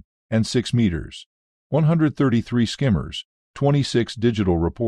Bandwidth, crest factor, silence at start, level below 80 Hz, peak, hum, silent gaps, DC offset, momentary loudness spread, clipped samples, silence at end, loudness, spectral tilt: 11 kHz; 14 dB; 0.3 s; -42 dBFS; -6 dBFS; none; 1.26-1.70 s, 3.25-3.54 s; under 0.1%; 13 LU; under 0.1%; 0 s; -21 LUFS; -6.5 dB/octave